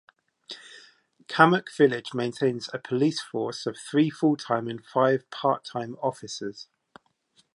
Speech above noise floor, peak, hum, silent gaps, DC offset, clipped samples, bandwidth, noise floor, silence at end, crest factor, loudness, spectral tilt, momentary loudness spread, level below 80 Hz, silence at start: 41 dB; -2 dBFS; none; none; under 0.1%; under 0.1%; 11.5 kHz; -66 dBFS; 0.9 s; 24 dB; -26 LUFS; -5.5 dB/octave; 15 LU; -76 dBFS; 0.5 s